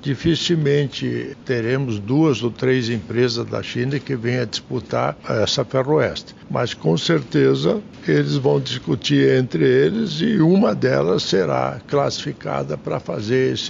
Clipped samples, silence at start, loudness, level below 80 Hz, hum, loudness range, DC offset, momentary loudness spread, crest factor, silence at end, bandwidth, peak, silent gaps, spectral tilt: under 0.1%; 0 s; -20 LUFS; -50 dBFS; none; 4 LU; under 0.1%; 9 LU; 16 dB; 0 s; 7.6 kHz; -4 dBFS; none; -6 dB/octave